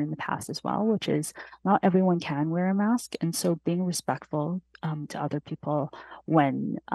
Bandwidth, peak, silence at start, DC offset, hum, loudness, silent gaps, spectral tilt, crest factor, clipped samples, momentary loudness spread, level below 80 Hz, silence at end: 12.5 kHz; -8 dBFS; 0 s; under 0.1%; none; -28 LUFS; none; -6 dB/octave; 20 dB; under 0.1%; 9 LU; -68 dBFS; 0 s